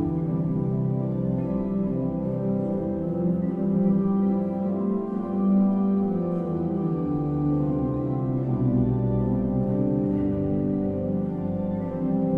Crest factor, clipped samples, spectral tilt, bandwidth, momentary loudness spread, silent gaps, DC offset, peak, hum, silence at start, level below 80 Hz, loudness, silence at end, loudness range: 12 dB; under 0.1%; -12.5 dB/octave; 3.2 kHz; 5 LU; none; under 0.1%; -12 dBFS; none; 0 s; -46 dBFS; -25 LUFS; 0 s; 2 LU